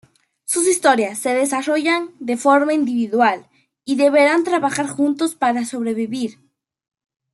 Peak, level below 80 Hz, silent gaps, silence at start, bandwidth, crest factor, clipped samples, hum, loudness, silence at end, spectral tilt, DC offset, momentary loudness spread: -2 dBFS; -72 dBFS; none; 0.5 s; 12.5 kHz; 16 dB; under 0.1%; none; -18 LUFS; 1 s; -3 dB/octave; under 0.1%; 10 LU